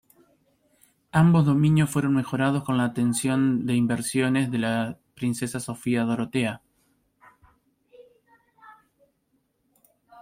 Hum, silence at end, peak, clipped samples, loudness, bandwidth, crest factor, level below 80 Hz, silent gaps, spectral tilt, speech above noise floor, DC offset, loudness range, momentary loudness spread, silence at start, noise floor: none; 0 s; -8 dBFS; under 0.1%; -24 LUFS; 15.5 kHz; 18 dB; -60 dBFS; none; -6 dB/octave; 49 dB; under 0.1%; 9 LU; 10 LU; 1.15 s; -71 dBFS